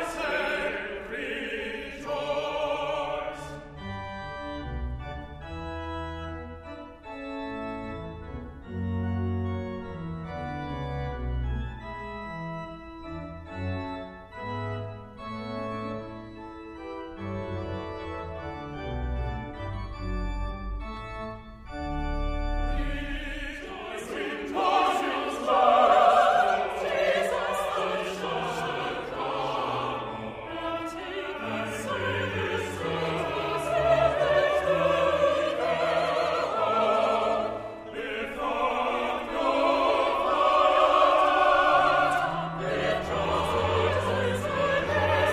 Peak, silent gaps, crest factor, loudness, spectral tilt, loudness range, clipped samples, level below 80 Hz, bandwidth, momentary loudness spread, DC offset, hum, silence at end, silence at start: -6 dBFS; none; 20 dB; -28 LUFS; -5.5 dB/octave; 14 LU; under 0.1%; -42 dBFS; 15 kHz; 17 LU; under 0.1%; none; 0 s; 0 s